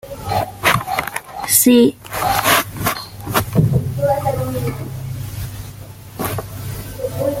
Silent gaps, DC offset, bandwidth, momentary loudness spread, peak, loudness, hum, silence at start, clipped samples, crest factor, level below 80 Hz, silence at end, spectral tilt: none; under 0.1%; 17 kHz; 16 LU; 0 dBFS; -18 LUFS; none; 0.05 s; under 0.1%; 18 dB; -40 dBFS; 0 s; -4.5 dB/octave